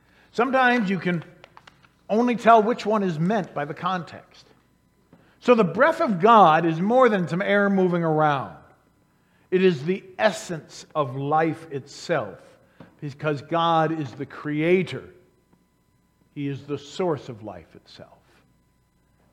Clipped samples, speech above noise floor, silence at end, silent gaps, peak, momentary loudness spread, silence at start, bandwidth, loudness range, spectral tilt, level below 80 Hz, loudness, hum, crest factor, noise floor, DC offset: under 0.1%; 43 dB; 1.3 s; none; -2 dBFS; 17 LU; 0.35 s; 12 kHz; 10 LU; -6.5 dB/octave; -68 dBFS; -22 LUFS; none; 22 dB; -65 dBFS; under 0.1%